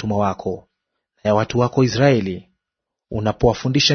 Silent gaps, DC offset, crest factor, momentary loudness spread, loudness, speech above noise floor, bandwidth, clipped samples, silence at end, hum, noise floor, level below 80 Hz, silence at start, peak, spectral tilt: none; under 0.1%; 18 dB; 13 LU; -19 LUFS; 65 dB; 6.6 kHz; under 0.1%; 0 s; none; -83 dBFS; -42 dBFS; 0 s; -2 dBFS; -5.5 dB/octave